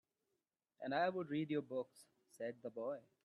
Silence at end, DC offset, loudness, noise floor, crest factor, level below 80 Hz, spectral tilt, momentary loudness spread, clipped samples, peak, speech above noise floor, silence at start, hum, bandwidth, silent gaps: 0.25 s; under 0.1%; -43 LUFS; -90 dBFS; 20 dB; -90 dBFS; -6.5 dB/octave; 10 LU; under 0.1%; -24 dBFS; 47 dB; 0.8 s; none; 12.5 kHz; none